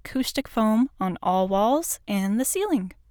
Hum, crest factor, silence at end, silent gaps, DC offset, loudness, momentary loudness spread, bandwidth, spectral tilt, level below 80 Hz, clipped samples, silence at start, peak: none; 12 dB; 0.2 s; none; under 0.1%; -24 LUFS; 5 LU; over 20 kHz; -4.5 dB/octave; -50 dBFS; under 0.1%; 0.05 s; -12 dBFS